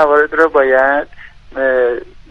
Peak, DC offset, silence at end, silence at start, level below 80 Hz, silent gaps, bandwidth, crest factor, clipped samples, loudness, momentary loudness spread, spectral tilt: 0 dBFS; under 0.1%; 0.1 s; 0 s; -42 dBFS; none; 7 kHz; 14 dB; under 0.1%; -13 LUFS; 15 LU; -5.5 dB/octave